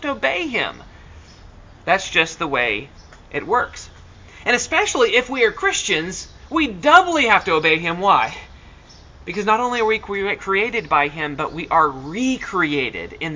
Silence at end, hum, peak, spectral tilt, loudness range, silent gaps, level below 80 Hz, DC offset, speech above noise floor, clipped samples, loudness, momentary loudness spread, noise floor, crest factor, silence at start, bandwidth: 0 s; none; 0 dBFS; -3 dB/octave; 6 LU; none; -46 dBFS; under 0.1%; 25 dB; under 0.1%; -18 LUFS; 11 LU; -44 dBFS; 20 dB; 0 s; 7.6 kHz